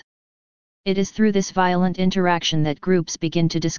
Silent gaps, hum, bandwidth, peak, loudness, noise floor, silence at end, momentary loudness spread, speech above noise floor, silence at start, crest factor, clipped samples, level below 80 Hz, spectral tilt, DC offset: 0.04-0.84 s; none; 7.2 kHz; -4 dBFS; -21 LUFS; under -90 dBFS; 0 s; 4 LU; over 70 dB; 0 s; 18 dB; under 0.1%; -48 dBFS; -5.5 dB/octave; 2%